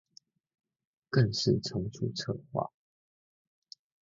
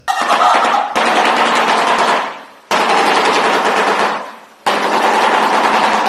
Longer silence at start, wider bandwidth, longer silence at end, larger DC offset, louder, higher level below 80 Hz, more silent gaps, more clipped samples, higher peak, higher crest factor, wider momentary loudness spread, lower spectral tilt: first, 1.1 s vs 0.05 s; second, 7.6 kHz vs 13.5 kHz; first, 1.35 s vs 0 s; neither; second, -32 LUFS vs -13 LUFS; about the same, -60 dBFS vs -60 dBFS; neither; neither; second, -12 dBFS vs 0 dBFS; first, 22 dB vs 14 dB; about the same, 9 LU vs 7 LU; first, -6 dB/octave vs -2 dB/octave